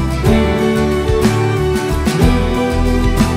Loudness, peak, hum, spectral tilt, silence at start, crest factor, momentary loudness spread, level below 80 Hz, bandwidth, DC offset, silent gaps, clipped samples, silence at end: -14 LUFS; 0 dBFS; none; -6.5 dB/octave; 0 s; 14 dB; 3 LU; -20 dBFS; 16.5 kHz; under 0.1%; none; under 0.1%; 0 s